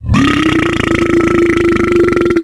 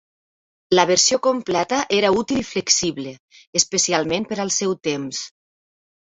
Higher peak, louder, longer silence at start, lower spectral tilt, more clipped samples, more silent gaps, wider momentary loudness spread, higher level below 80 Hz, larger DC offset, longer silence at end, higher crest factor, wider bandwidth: about the same, 0 dBFS vs -2 dBFS; first, -11 LUFS vs -19 LUFS; second, 0 s vs 0.7 s; first, -6 dB/octave vs -2.5 dB/octave; neither; second, none vs 3.20-3.28 s, 3.47-3.53 s; second, 2 LU vs 11 LU; first, -28 dBFS vs -56 dBFS; neither; second, 0 s vs 0.75 s; second, 10 dB vs 20 dB; first, 12 kHz vs 8.4 kHz